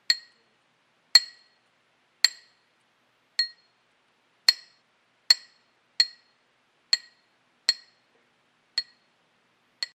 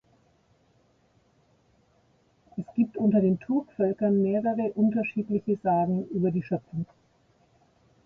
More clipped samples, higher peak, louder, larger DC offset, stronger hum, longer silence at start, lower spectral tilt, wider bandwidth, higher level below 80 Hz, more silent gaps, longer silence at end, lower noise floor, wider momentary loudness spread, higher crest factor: neither; first, 0 dBFS vs -14 dBFS; first, -24 LUFS vs -27 LUFS; neither; neither; second, 0.1 s vs 2.55 s; second, 4.5 dB/octave vs -11.5 dB/octave; first, 13.5 kHz vs 3 kHz; second, -90 dBFS vs -66 dBFS; neither; second, 0.1 s vs 1.2 s; about the same, -68 dBFS vs -65 dBFS; first, 15 LU vs 11 LU; first, 30 dB vs 16 dB